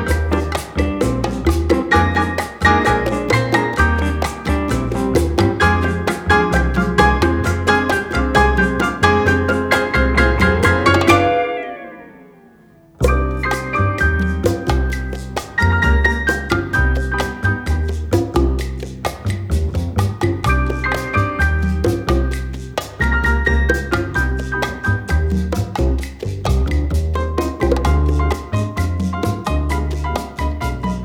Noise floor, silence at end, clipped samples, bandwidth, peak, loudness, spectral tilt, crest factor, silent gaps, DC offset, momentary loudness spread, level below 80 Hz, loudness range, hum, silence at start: -47 dBFS; 0 s; under 0.1%; 16.5 kHz; 0 dBFS; -17 LUFS; -6 dB/octave; 16 dB; none; under 0.1%; 8 LU; -22 dBFS; 5 LU; none; 0 s